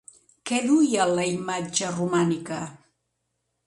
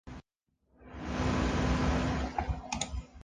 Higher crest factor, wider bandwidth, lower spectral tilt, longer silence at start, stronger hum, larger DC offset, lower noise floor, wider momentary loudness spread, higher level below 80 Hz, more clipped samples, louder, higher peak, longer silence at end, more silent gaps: about the same, 18 dB vs 16 dB; first, 11.5 kHz vs 10 kHz; about the same, -4.5 dB/octave vs -5.5 dB/octave; first, 0.45 s vs 0.05 s; neither; neither; about the same, -77 dBFS vs -78 dBFS; second, 13 LU vs 18 LU; second, -68 dBFS vs -38 dBFS; neither; first, -24 LUFS vs -33 LUFS; first, -8 dBFS vs -16 dBFS; first, 0.9 s vs 0 s; neither